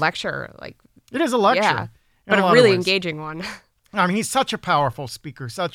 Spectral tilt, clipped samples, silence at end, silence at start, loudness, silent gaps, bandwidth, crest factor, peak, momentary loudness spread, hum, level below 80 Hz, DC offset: -4.5 dB/octave; under 0.1%; 0.05 s; 0 s; -19 LUFS; none; 16.5 kHz; 20 dB; -2 dBFS; 18 LU; none; -58 dBFS; under 0.1%